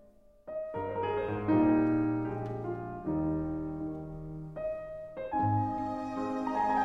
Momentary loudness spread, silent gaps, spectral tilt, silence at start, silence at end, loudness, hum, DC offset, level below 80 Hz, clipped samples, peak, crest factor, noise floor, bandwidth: 14 LU; none; -9.5 dB/octave; 0.45 s; 0 s; -33 LUFS; none; under 0.1%; -54 dBFS; under 0.1%; -16 dBFS; 16 dB; -53 dBFS; 6.6 kHz